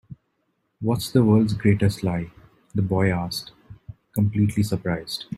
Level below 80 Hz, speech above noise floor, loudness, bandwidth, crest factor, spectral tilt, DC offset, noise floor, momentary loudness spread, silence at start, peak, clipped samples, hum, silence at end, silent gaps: -50 dBFS; 51 dB; -23 LUFS; 16 kHz; 18 dB; -7 dB/octave; under 0.1%; -72 dBFS; 12 LU; 0.1 s; -6 dBFS; under 0.1%; none; 0 s; none